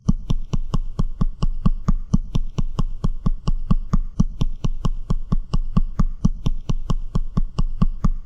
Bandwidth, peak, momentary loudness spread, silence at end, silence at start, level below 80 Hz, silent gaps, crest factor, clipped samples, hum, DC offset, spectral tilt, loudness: 7 kHz; -2 dBFS; 5 LU; 0 s; 0.05 s; -20 dBFS; none; 16 dB; under 0.1%; none; under 0.1%; -8 dB/octave; -26 LUFS